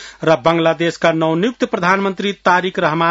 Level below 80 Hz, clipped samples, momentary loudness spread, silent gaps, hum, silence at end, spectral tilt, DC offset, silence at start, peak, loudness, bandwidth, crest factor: -56 dBFS; under 0.1%; 4 LU; none; none; 0 s; -5.5 dB/octave; under 0.1%; 0 s; 0 dBFS; -16 LUFS; 8 kHz; 16 dB